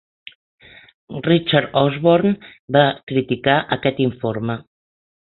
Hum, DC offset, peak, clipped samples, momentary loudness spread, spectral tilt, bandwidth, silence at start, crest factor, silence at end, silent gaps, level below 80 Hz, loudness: none; under 0.1%; -2 dBFS; under 0.1%; 11 LU; -11 dB/octave; 4.3 kHz; 1.1 s; 18 dB; 0.6 s; 2.59-2.68 s, 3.03-3.07 s; -56 dBFS; -18 LUFS